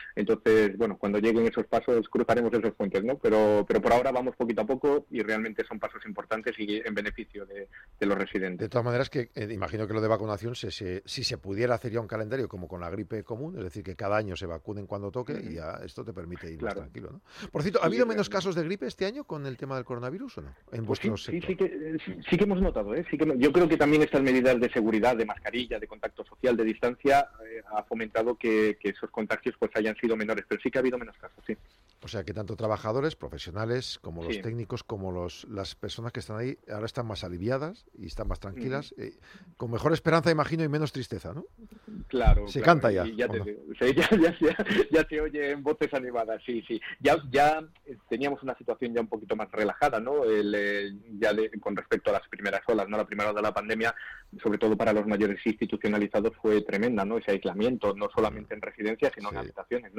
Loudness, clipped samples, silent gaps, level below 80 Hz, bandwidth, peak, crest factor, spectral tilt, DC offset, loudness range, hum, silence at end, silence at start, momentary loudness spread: -28 LUFS; under 0.1%; none; -44 dBFS; 15.5 kHz; -6 dBFS; 22 dB; -6.5 dB/octave; under 0.1%; 9 LU; none; 0 s; 0 s; 14 LU